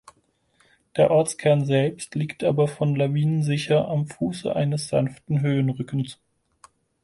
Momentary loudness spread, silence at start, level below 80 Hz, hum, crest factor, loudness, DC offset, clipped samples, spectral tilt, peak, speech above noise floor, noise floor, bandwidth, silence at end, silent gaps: 9 LU; 0.95 s; -60 dBFS; none; 18 dB; -23 LUFS; under 0.1%; under 0.1%; -6.5 dB/octave; -6 dBFS; 43 dB; -65 dBFS; 11.5 kHz; 0.9 s; none